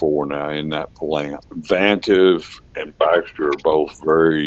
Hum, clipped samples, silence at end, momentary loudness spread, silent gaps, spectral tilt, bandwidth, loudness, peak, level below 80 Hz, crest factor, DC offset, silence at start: none; under 0.1%; 0 s; 14 LU; none; -6 dB/octave; 7.8 kHz; -19 LUFS; 0 dBFS; -50 dBFS; 18 dB; under 0.1%; 0 s